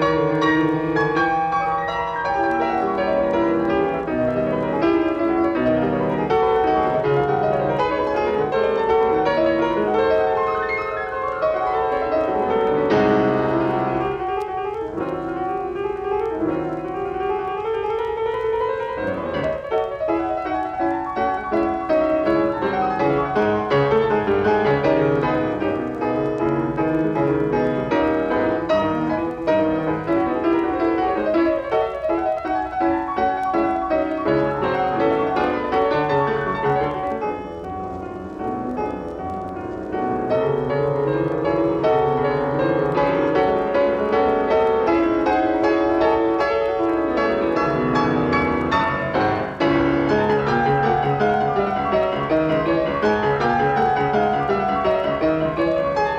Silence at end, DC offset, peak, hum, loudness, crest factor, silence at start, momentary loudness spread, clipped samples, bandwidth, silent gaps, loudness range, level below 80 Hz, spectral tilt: 0 s; under 0.1%; -6 dBFS; none; -20 LUFS; 14 dB; 0 s; 6 LU; under 0.1%; 7.6 kHz; none; 5 LU; -44 dBFS; -7.5 dB/octave